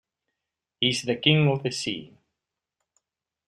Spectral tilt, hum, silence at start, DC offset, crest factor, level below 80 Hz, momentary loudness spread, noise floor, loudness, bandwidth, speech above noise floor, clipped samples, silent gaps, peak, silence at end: -4.5 dB/octave; none; 0.8 s; under 0.1%; 24 dB; -64 dBFS; 11 LU; -86 dBFS; -24 LUFS; 11.5 kHz; 62 dB; under 0.1%; none; -4 dBFS; 1.4 s